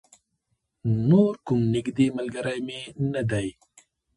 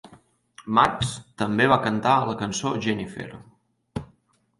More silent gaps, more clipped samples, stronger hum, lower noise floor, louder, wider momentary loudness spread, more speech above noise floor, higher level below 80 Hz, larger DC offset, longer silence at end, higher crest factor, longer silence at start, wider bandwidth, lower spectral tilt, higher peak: neither; neither; neither; first, -76 dBFS vs -63 dBFS; about the same, -25 LUFS vs -23 LUFS; second, 12 LU vs 18 LU; first, 52 dB vs 40 dB; about the same, -56 dBFS vs -52 dBFS; neither; about the same, 0.65 s vs 0.55 s; about the same, 18 dB vs 22 dB; first, 0.85 s vs 0.05 s; about the same, 11.5 kHz vs 11.5 kHz; first, -7.5 dB/octave vs -5 dB/octave; about the same, -6 dBFS vs -4 dBFS